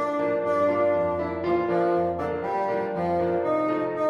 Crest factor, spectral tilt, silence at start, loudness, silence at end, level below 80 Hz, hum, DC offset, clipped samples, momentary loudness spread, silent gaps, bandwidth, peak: 12 dB; -8 dB/octave; 0 s; -25 LUFS; 0 s; -56 dBFS; none; under 0.1%; under 0.1%; 4 LU; none; 7.2 kHz; -12 dBFS